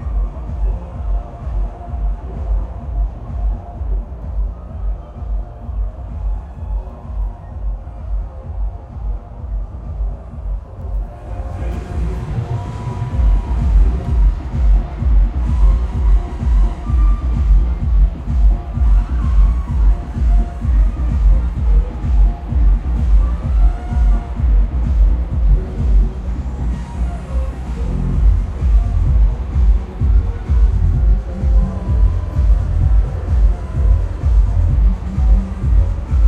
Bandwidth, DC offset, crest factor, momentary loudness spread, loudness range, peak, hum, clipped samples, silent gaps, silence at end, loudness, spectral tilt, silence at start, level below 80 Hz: 3.4 kHz; under 0.1%; 14 dB; 11 LU; 10 LU; -2 dBFS; none; under 0.1%; none; 0 s; -19 LUFS; -9 dB/octave; 0 s; -16 dBFS